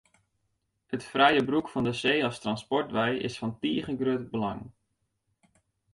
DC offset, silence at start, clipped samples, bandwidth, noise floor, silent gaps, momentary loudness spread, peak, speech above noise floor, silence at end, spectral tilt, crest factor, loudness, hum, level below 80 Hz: under 0.1%; 0.9 s; under 0.1%; 11.5 kHz; -78 dBFS; none; 11 LU; -8 dBFS; 50 dB; 1.25 s; -5.5 dB/octave; 22 dB; -28 LUFS; none; -62 dBFS